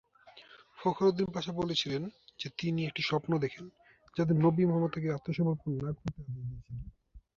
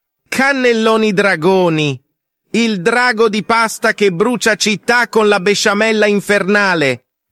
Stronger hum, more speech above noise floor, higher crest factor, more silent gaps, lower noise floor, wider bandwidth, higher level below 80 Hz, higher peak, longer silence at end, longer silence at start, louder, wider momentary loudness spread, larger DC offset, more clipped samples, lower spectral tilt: neither; second, 25 dB vs 54 dB; first, 18 dB vs 12 dB; neither; second, -57 dBFS vs -67 dBFS; second, 7.2 kHz vs 15 kHz; about the same, -58 dBFS vs -56 dBFS; second, -14 dBFS vs -2 dBFS; second, 0.2 s vs 0.35 s; about the same, 0.25 s vs 0.3 s; second, -32 LUFS vs -13 LUFS; first, 16 LU vs 5 LU; neither; neither; first, -7 dB/octave vs -4 dB/octave